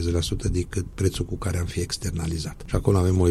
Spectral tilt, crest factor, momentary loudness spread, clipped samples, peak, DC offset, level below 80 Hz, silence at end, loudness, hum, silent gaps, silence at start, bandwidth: -6 dB/octave; 16 dB; 8 LU; under 0.1%; -8 dBFS; under 0.1%; -34 dBFS; 0 s; -26 LUFS; none; none; 0 s; 13.5 kHz